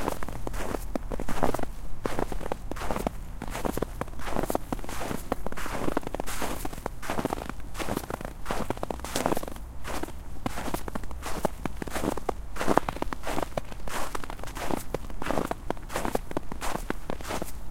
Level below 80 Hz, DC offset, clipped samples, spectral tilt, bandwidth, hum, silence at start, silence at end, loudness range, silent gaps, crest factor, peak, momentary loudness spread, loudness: -38 dBFS; under 0.1%; under 0.1%; -5 dB/octave; 16.5 kHz; none; 0 s; 0 s; 2 LU; none; 28 dB; 0 dBFS; 7 LU; -33 LUFS